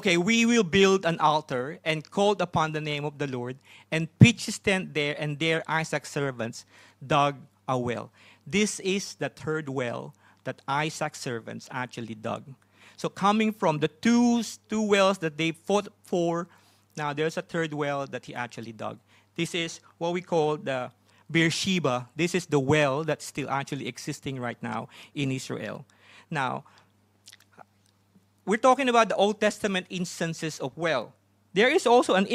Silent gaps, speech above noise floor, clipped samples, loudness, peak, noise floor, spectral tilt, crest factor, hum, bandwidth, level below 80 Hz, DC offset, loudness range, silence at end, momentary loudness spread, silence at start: none; 39 dB; under 0.1%; -27 LUFS; 0 dBFS; -65 dBFS; -5 dB/octave; 26 dB; none; 15 kHz; -62 dBFS; under 0.1%; 8 LU; 0 s; 15 LU; 0 s